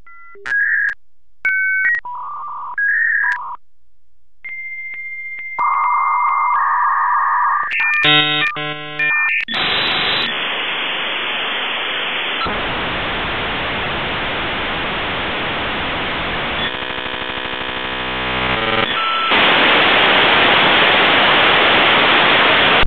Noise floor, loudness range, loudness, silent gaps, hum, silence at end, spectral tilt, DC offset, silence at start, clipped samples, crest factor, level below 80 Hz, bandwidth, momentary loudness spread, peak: -62 dBFS; 9 LU; -15 LUFS; none; none; 0 s; -5 dB/octave; 1%; 0.05 s; under 0.1%; 16 dB; -42 dBFS; 16 kHz; 13 LU; 0 dBFS